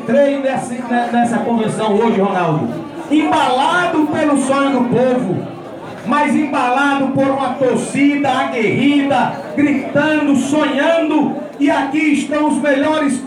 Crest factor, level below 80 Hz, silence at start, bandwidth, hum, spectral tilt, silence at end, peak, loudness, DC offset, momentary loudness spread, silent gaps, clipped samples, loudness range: 12 dB; -58 dBFS; 0 s; 11.5 kHz; none; -5.5 dB/octave; 0 s; -4 dBFS; -15 LUFS; under 0.1%; 6 LU; none; under 0.1%; 1 LU